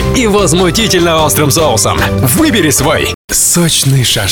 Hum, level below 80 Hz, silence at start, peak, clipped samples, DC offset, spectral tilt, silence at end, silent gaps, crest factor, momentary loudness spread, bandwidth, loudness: none; -26 dBFS; 0 s; 0 dBFS; under 0.1%; under 0.1%; -3.5 dB/octave; 0 s; 3.14-3.28 s; 8 dB; 3 LU; over 20 kHz; -9 LUFS